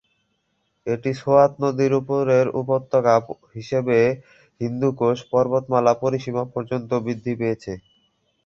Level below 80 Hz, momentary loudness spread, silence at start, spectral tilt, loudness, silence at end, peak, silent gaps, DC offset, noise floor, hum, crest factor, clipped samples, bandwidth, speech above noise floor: -58 dBFS; 12 LU; 0.85 s; -7.5 dB/octave; -21 LUFS; 0.65 s; -2 dBFS; none; under 0.1%; -71 dBFS; none; 20 dB; under 0.1%; 7.4 kHz; 50 dB